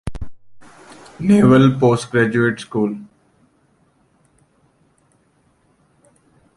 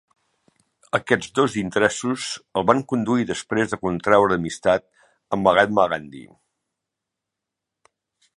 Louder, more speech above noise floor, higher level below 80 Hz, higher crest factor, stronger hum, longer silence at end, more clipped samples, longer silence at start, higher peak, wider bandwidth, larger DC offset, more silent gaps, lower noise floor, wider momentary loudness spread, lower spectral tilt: first, -15 LUFS vs -21 LUFS; second, 45 dB vs 63 dB; first, -44 dBFS vs -54 dBFS; about the same, 18 dB vs 22 dB; neither; first, 3.55 s vs 2.15 s; neither; second, 0.05 s vs 0.95 s; about the same, -2 dBFS vs 0 dBFS; about the same, 11.5 kHz vs 11.5 kHz; neither; neither; second, -60 dBFS vs -84 dBFS; first, 22 LU vs 9 LU; first, -7.5 dB/octave vs -5 dB/octave